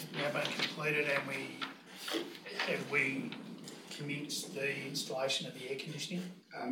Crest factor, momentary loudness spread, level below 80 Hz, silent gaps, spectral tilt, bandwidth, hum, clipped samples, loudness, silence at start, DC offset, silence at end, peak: 20 dB; 12 LU; under -90 dBFS; none; -3.5 dB/octave; 18 kHz; none; under 0.1%; -37 LUFS; 0 s; under 0.1%; 0 s; -18 dBFS